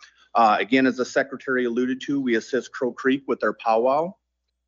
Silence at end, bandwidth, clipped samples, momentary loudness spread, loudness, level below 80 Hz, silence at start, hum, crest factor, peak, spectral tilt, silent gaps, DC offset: 0.55 s; 7.6 kHz; under 0.1%; 7 LU; -23 LUFS; -74 dBFS; 0.35 s; none; 16 dB; -6 dBFS; -5 dB/octave; none; under 0.1%